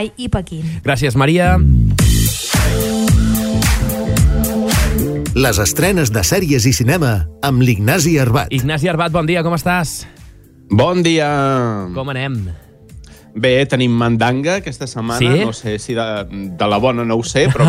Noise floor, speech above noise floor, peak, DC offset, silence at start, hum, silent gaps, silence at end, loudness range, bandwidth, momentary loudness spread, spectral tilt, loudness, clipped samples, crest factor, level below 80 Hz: -40 dBFS; 26 dB; -2 dBFS; under 0.1%; 0 s; none; none; 0 s; 4 LU; 16.5 kHz; 8 LU; -5 dB/octave; -15 LUFS; under 0.1%; 12 dB; -24 dBFS